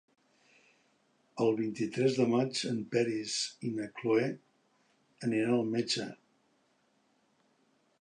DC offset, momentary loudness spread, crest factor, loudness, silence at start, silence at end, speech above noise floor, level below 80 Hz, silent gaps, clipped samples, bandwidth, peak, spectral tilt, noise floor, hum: under 0.1%; 9 LU; 18 dB; -32 LUFS; 1.35 s; 1.85 s; 41 dB; -80 dBFS; none; under 0.1%; 11 kHz; -16 dBFS; -5 dB/octave; -72 dBFS; none